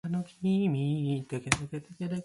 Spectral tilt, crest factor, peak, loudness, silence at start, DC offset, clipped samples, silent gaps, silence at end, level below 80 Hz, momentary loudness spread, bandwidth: -5.5 dB/octave; 28 dB; -2 dBFS; -31 LUFS; 0.05 s; under 0.1%; under 0.1%; none; 0 s; -56 dBFS; 9 LU; 11.5 kHz